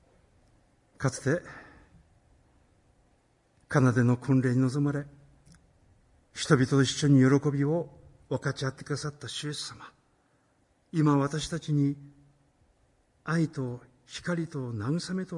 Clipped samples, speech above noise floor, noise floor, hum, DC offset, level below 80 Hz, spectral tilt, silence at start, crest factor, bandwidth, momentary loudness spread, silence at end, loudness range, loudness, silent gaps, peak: under 0.1%; 41 dB; -68 dBFS; none; under 0.1%; -62 dBFS; -6 dB/octave; 1 s; 20 dB; 11.5 kHz; 17 LU; 0 s; 8 LU; -28 LUFS; none; -8 dBFS